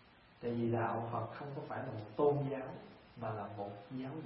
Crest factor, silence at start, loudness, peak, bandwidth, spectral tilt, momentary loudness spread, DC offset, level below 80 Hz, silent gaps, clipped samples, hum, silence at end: 20 dB; 0 s; -39 LUFS; -20 dBFS; 5.6 kHz; -7.5 dB/octave; 12 LU; under 0.1%; -72 dBFS; none; under 0.1%; none; 0 s